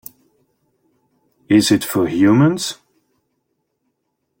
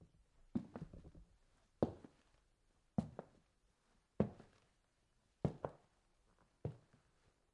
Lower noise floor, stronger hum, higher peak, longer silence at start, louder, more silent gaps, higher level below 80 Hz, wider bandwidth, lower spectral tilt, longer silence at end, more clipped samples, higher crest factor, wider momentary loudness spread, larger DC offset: second, -72 dBFS vs -79 dBFS; neither; first, -2 dBFS vs -20 dBFS; first, 1.5 s vs 0 s; first, -15 LUFS vs -46 LUFS; neither; first, -56 dBFS vs -68 dBFS; first, 17 kHz vs 10.5 kHz; second, -5.5 dB/octave vs -9.5 dB/octave; first, 1.65 s vs 0.75 s; neither; second, 18 dB vs 30 dB; second, 12 LU vs 20 LU; neither